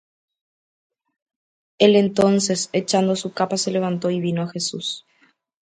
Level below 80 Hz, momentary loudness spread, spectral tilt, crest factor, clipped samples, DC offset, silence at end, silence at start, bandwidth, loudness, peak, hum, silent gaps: -64 dBFS; 9 LU; -4.5 dB/octave; 20 dB; under 0.1%; under 0.1%; 0.65 s; 1.8 s; 9.6 kHz; -20 LUFS; -2 dBFS; none; none